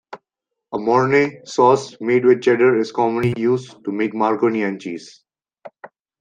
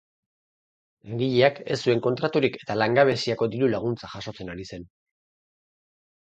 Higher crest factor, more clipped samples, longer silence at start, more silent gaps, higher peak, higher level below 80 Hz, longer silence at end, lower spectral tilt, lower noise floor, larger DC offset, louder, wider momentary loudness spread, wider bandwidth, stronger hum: second, 16 dB vs 22 dB; neither; second, 0.1 s vs 1.05 s; neither; about the same, -2 dBFS vs -4 dBFS; about the same, -62 dBFS vs -60 dBFS; second, 0.35 s vs 1.45 s; about the same, -6.5 dB/octave vs -6 dB/octave; second, -82 dBFS vs under -90 dBFS; neither; first, -18 LUFS vs -24 LUFS; second, 11 LU vs 16 LU; about the same, 9.2 kHz vs 8.8 kHz; neither